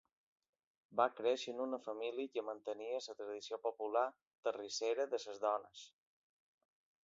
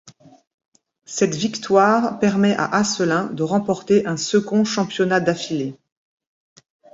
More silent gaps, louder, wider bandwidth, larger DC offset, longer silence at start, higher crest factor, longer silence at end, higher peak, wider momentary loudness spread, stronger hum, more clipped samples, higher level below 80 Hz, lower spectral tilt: second, 4.27-4.31 s, 4.38-4.43 s vs 0.47-0.58 s, 0.68-0.72 s; second, -41 LUFS vs -19 LUFS; about the same, 7.6 kHz vs 7.8 kHz; neither; first, 0.9 s vs 0.05 s; first, 24 dB vs 18 dB; about the same, 1.15 s vs 1.2 s; second, -18 dBFS vs -2 dBFS; about the same, 8 LU vs 7 LU; neither; neither; second, under -90 dBFS vs -60 dBFS; second, -1 dB/octave vs -5 dB/octave